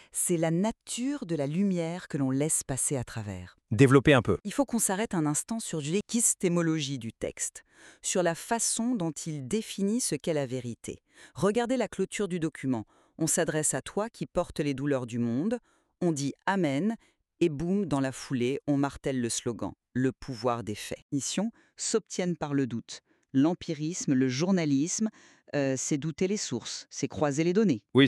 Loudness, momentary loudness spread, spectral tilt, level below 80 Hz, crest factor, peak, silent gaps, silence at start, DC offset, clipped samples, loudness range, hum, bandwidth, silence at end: -29 LUFS; 10 LU; -4.5 dB/octave; -58 dBFS; 24 dB; -6 dBFS; 21.02-21.09 s; 0.15 s; under 0.1%; under 0.1%; 5 LU; none; 13.5 kHz; 0 s